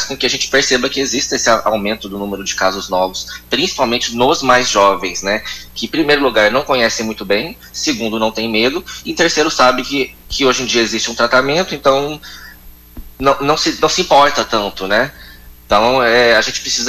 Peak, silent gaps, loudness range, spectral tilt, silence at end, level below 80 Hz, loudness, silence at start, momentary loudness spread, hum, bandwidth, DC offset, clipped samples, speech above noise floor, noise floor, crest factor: -2 dBFS; none; 2 LU; -2.5 dB/octave; 0 s; -40 dBFS; -14 LUFS; 0 s; 9 LU; none; 16 kHz; under 0.1%; under 0.1%; 24 dB; -38 dBFS; 14 dB